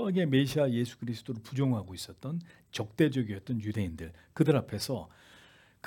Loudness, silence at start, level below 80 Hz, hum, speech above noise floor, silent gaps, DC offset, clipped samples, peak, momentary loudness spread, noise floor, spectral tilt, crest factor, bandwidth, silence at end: -32 LUFS; 0 s; -64 dBFS; none; 28 dB; none; under 0.1%; under 0.1%; -12 dBFS; 13 LU; -59 dBFS; -6.5 dB/octave; 20 dB; 18 kHz; 0.8 s